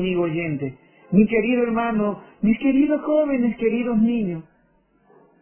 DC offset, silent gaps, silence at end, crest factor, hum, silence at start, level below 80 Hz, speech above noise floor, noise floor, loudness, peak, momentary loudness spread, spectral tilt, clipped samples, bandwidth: under 0.1%; none; 1 s; 16 dB; none; 0 s; -54 dBFS; 41 dB; -61 dBFS; -21 LUFS; -4 dBFS; 8 LU; -11.5 dB/octave; under 0.1%; 3.3 kHz